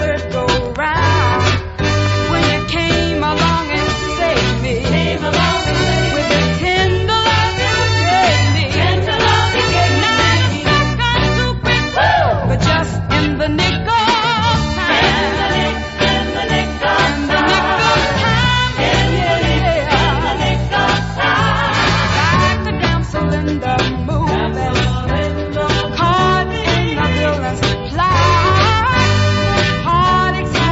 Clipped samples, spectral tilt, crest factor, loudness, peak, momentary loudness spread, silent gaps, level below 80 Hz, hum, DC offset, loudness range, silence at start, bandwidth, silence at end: under 0.1%; -5 dB/octave; 14 dB; -14 LUFS; 0 dBFS; 5 LU; none; -26 dBFS; none; under 0.1%; 2 LU; 0 s; 8 kHz; 0 s